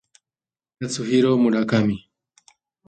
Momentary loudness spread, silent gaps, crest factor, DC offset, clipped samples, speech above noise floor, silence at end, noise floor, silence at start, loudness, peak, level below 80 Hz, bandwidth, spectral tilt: 14 LU; none; 16 dB; under 0.1%; under 0.1%; over 71 dB; 0.9 s; under -90 dBFS; 0.8 s; -20 LUFS; -6 dBFS; -58 dBFS; 9.2 kHz; -6 dB/octave